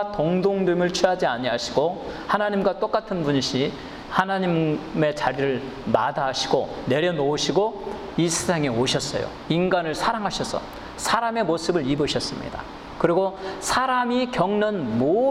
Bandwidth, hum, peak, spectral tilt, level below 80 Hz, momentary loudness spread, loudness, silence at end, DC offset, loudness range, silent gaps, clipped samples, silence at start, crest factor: 16 kHz; none; -6 dBFS; -4.5 dB/octave; -48 dBFS; 7 LU; -23 LUFS; 0 s; under 0.1%; 1 LU; none; under 0.1%; 0 s; 18 dB